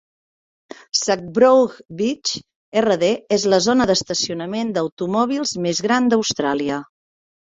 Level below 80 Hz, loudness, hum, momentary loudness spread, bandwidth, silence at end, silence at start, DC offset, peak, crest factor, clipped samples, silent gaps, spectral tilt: -56 dBFS; -19 LUFS; none; 8 LU; 8 kHz; 0.75 s; 0.95 s; under 0.1%; -2 dBFS; 18 dB; under 0.1%; 2.55-2.72 s, 4.92-4.97 s; -3.5 dB/octave